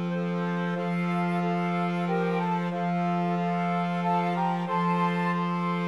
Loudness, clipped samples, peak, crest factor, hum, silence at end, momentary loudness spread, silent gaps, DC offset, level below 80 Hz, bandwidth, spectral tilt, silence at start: -27 LUFS; under 0.1%; -16 dBFS; 12 dB; none; 0 s; 3 LU; none; 0.1%; -80 dBFS; 6.8 kHz; -8 dB/octave; 0 s